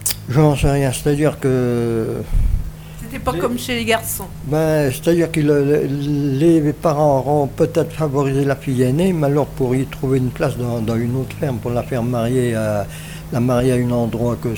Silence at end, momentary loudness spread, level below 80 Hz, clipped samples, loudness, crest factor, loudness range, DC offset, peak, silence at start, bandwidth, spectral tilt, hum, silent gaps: 0 s; 7 LU; -30 dBFS; under 0.1%; -18 LUFS; 14 dB; 4 LU; under 0.1%; -2 dBFS; 0 s; over 20 kHz; -6.5 dB/octave; none; none